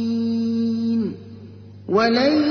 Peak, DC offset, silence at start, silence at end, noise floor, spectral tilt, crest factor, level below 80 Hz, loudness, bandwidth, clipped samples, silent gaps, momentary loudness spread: -6 dBFS; under 0.1%; 0 s; 0 s; -40 dBFS; -6.5 dB/octave; 14 dB; -62 dBFS; -20 LUFS; 6.4 kHz; under 0.1%; none; 23 LU